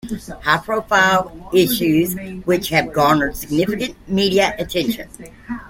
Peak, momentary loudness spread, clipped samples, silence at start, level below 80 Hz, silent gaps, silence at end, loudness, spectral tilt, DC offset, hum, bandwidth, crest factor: -2 dBFS; 10 LU; under 0.1%; 0.05 s; -42 dBFS; none; 0 s; -18 LUFS; -4.5 dB/octave; under 0.1%; none; 16.5 kHz; 18 dB